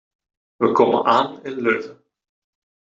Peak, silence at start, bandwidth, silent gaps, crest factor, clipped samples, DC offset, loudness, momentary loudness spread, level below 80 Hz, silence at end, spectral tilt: -2 dBFS; 0.6 s; 7.6 kHz; none; 18 dB; under 0.1%; under 0.1%; -19 LUFS; 9 LU; -66 dBFS; 0.95 s; -6 dB/octave